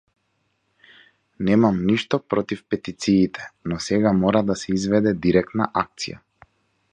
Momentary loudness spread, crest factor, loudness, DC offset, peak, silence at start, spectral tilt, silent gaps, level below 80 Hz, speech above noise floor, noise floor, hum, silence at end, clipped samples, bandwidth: 10 LU; 20 dB; -22 LUFS; under 0.1%; -2 dBFS; 1.4 s; -6 dB/octave; none; -50 dBFS; 50 dB; -70 dBFS; none; 0.75 s; under 0.1%; 9.6 kHz